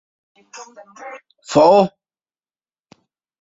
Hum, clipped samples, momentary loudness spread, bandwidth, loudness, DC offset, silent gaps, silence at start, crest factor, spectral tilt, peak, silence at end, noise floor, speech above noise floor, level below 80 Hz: none; under 0.1%; 26 LU; 8 kHz; -14 LUFS; under 0.1%; none; 0.55 s; 20 dB; -5.5 dB/octave; -2 dBFS; 1.55 s; under -90 dBFS; over 73 dB; -60 dBFS